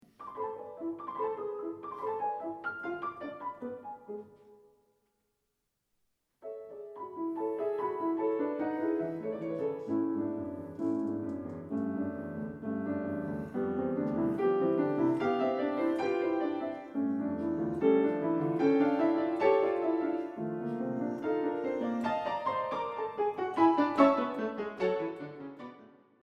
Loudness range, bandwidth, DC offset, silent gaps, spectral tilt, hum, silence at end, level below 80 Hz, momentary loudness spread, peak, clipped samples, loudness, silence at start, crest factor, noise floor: 12 LU; 6.8 kHz; under 0.1%; none; -8 dB/octave; none; 0.4 s; -70 dBFS; 14 LU; -10 dBFS; under 0.1%; -32 LUFS; 0.2 s; 22 dB; -82 dBFS